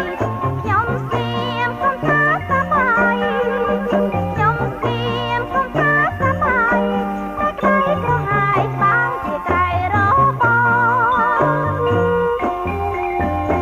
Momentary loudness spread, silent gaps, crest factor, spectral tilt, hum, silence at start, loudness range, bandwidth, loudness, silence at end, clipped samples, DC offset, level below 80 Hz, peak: 7 LU; none; 16 dB; -7.5 dB/octave; none; 0 s; 2 LU; 16 kHz; -17 LUFS; 0 s; under 0.1%; under 0.1%; -38 dBFS; -2 dBFS